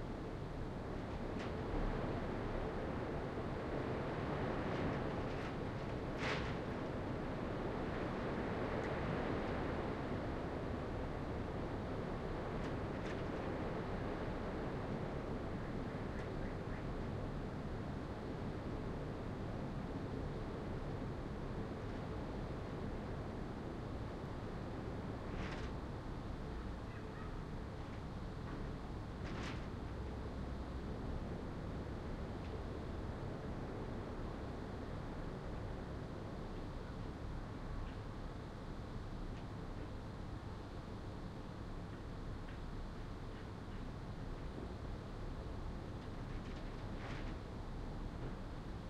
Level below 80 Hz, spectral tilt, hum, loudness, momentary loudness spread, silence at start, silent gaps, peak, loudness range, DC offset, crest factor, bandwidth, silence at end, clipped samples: -50 dBFS; -7.5 dB/octave; none; -45 LUFS; 7 LU; 0 s; none; -28 dBFS; 7 LU; under 0.1%; 16 dB; 11.5 kHz; 0 s; under 0.1%